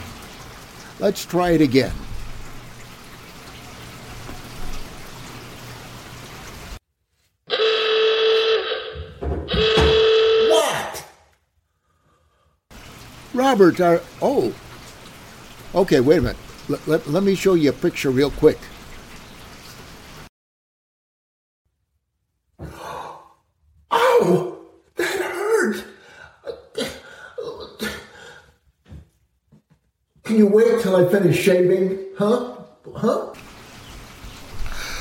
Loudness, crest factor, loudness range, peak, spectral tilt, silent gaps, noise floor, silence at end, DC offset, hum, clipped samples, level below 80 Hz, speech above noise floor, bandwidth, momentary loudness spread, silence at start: -19 LUFS; 20 dB; 18 LU; -2 dBFS; -5 dB/octave; 20.29-21.65 s; -74 dBFS; 0 s; under 0.1%; none; under 0.1%; -40 dBFS; 56 dB; 17 kHz; 24 LU; 0 s